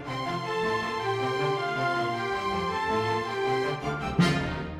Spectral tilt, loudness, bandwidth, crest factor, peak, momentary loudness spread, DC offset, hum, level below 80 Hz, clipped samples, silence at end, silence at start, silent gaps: -5.5 dB/octave; -28 LUFS; 15 kHz; 16 dB; -12 dBFS; 5 LU; under 0.1%; none; -50 dBFS; under 0.1%; 0 s; 0 s; none